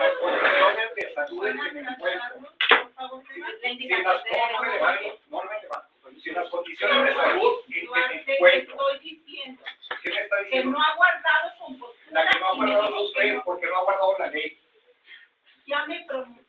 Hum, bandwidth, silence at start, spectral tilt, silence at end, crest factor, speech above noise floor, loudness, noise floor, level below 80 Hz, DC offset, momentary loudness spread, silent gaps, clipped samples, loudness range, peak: none; 7.2 kHz; 0 s; -3.5 dB/octave; 0.15 s; 24 dB; 35 dB; -23 LUFS; -62 dBFS; -74 dBFS; under 0.1%; 17 LU; none; under 0.1%; 4 LU; -2 dBFS